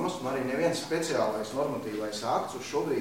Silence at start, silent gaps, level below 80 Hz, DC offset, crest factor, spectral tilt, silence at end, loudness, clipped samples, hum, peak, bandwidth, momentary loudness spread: 0 s; none; -64 dBFS; 0.1%; 16 dB; -4.5 dB/octave; 0 s; -31 LUFS; under 0.1%; none; -14 dBFS; 16 kHz; 4 LU